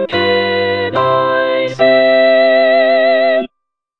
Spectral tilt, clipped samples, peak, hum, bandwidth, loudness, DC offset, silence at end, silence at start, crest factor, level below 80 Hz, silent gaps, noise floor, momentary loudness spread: -6 dB/octave; under 0.1%; 0 dBFS; none; 6.2 kHz; -12 LUFS; under 0.1%; 0.55 s; 0 s; 12 dB; -56 dBFS; none; -74 dBFS; 6 LU